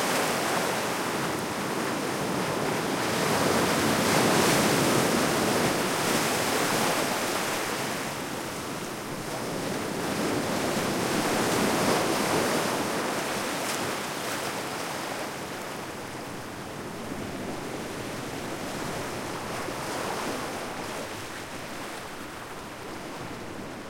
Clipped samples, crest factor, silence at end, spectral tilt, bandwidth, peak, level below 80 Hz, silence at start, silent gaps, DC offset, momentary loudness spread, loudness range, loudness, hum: under 0.1%; 18 dB; 0 s; -3.5 dB/octave; 16.5 kHz; -10 dBFS; -58 dBFS; 0 s; none; under 0.1%; 13 LU; 11 LU; -28 LUFS; none